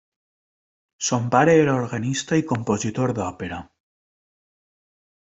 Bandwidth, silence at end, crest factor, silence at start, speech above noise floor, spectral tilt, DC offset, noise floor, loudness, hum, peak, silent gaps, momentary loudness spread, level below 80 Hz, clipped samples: 8.2 kHz; 1.65 s; 22 dB; 1 s; over 69 dB; -5.5 dB/octave; under 0.1%; under -90 dBFS; -21 LUFS; none; -2 dBFS; none; 13 LU; -58 dBFS; under 0.1%